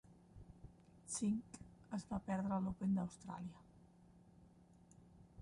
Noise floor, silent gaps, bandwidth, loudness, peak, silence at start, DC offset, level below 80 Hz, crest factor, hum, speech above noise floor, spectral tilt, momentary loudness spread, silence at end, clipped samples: -66 dBFS; none; 11 kHz; -43 LUFS; -30 dBFS; 0.1 s; under 0.1%; -68 dBFS; 16 dB; none; 24 dB; -6 dB/octave; 24 LU; 0 s; under 0.1%